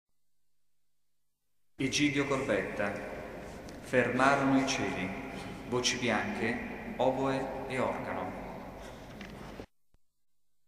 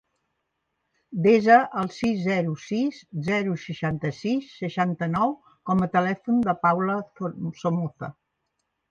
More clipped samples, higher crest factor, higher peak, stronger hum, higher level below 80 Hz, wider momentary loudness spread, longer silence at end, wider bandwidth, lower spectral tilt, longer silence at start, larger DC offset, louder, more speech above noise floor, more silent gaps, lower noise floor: neither; about the same, 24 dB vs 20 dB; second, -10 dBFS vs -4 dBFS; first, 50 Hz at -55 dBFS vs none; about the same, -56 dBFS vs -60 dBFS; first, 18 LU vs 12 LU; first, 1.05 s vs 0.8 s; first, 15 kHz vs 7.6 kHz; second, -4 dB/octave vs -7.5 dB/octave; first, 1.8 s vs 1.1 s; neither; second, -31 LUFS vs -24 LUFS; about the same, 55 dB vs 54 dB; neither; first, -86 dBFS vs -78 dBFS